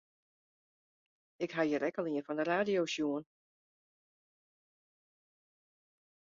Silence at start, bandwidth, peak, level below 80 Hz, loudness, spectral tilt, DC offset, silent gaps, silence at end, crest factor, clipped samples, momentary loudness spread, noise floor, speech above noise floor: 1.4 s; 7.4 kHz; -18 dBFS; -82 dBFS; -35 LUFS; -3.5 dB/octave; under 0.1%; none; 3.15 s; 22 dB; under 0.1%; 8 LU; under -90 dBFS; over 56 dB